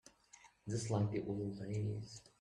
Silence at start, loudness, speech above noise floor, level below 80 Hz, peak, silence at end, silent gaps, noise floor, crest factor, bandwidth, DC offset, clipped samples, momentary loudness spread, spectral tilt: 0.35 s; -41 LUFS; 26 dB; -68 dBFS; -24 dBFS; 0.2 s; none; -65 dBFS; 18 dB; 11 kHz; under 0.1%; under 0.1%; 24 LU; -6.5 dB/octave